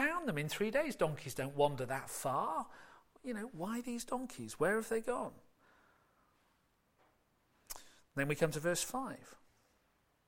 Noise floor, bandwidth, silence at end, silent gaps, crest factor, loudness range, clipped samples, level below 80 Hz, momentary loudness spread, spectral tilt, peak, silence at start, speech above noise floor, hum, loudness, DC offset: -76 dBFS; 16.5 kHz; 0.9 s; none; 22 dB; 6 LU; under 0.1%; -66 dBFS; 13 LU; -4.5 dB/octave; -18 dBFS; 0 s; 38 dB; none; -38 LUFS; under 0.1%